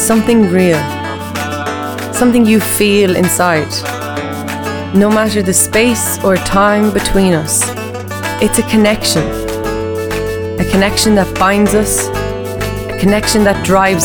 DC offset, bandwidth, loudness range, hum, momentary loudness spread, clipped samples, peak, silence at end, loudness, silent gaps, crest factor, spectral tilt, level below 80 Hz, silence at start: under 0.1%; over 20 kHz; 2 LU; none; 10 LU; under 0.1%; 0 dBFS; 0 s; -12 LUFS; none; 12 dB; -4 dB/octave; -30 dBFS; 0 s